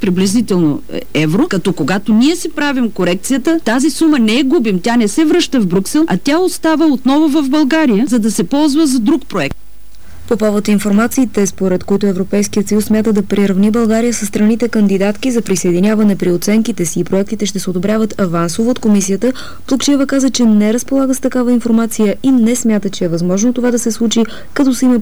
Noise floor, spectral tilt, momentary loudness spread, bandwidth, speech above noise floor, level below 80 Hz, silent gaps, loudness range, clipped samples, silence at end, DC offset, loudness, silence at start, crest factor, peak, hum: -40 dBFS; -5 dB/octave; 5 LU; over 20 kHz; 27 dB; -42 dBFS; none; 2 LU; under 0.1%; 0 s; 6%; -13 LUFS; 0 s; 8 dB; -4 dBFS; none